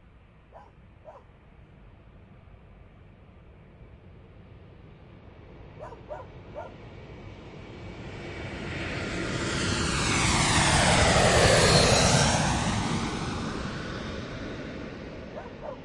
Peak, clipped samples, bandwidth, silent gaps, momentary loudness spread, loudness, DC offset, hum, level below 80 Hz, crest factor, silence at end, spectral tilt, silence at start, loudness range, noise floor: -6 dBFS; under 0.1%; 11.5 kHz; none; 25 LU; -24 LUFS; under 0.1%; none; -42 dBFS; 22 dB; 0 s; -3.5 dB/octave; 0.55 s; 24 LU; -54 dBFS